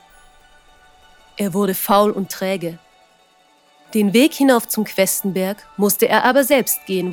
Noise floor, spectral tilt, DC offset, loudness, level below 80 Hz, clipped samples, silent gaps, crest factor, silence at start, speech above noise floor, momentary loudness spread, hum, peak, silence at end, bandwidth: -55 dBFS; -4 dB/octave; under 0.1%; -17 LUFS; -58 dBFS; under 0.1%; none; 18 dB; 1.4 s; 38 dB; 10 LU; none; -2 dBFS; 0 s; over 20 kHz